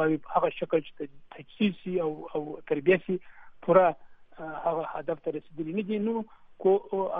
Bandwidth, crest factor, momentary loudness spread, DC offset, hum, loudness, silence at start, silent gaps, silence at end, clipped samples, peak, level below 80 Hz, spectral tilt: 3.9 kHz; 22 dB; 17 LU; under 0.1%; none; -29 LUFS; 0 s; none; 0 s; under 0.1%; -6 dBFS; -64 dBFS; -10 dB/octave